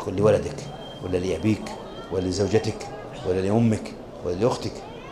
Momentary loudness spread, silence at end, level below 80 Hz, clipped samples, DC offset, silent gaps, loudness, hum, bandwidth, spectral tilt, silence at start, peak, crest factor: 14 LU; 0 s; -44 dBFS; under 0.1%; under 0.1%; none; -25 LUFS; none; 13.5 kHz; -6.5 dB/octave; 0 s; -6 dBFS; 20 dB